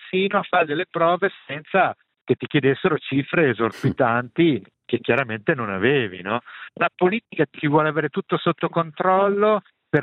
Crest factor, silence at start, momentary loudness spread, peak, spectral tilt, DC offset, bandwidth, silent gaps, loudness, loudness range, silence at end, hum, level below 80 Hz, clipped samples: 18 dB; 0 s; 6 LU; -4 dBFS; -8 dB/octave; under 0.1%; 9.2 kHz; none; -21 LUFS; 1 LU; 0 s; none; -66 dBFS; under 0.1%